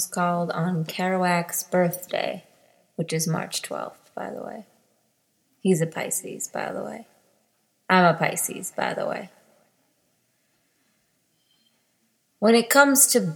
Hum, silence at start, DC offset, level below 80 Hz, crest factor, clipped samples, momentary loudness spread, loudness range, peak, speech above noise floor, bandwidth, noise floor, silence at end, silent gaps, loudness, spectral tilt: none; 0 s; under 0.1%; -76 dBFS; 24 dB; under 0.1%; 20 LU; 7 LU; -2 dBFS; 46 dB; 19.5 kHz; -69 dBFS; 0 s; none; -23 LUFS; -4 dB/octave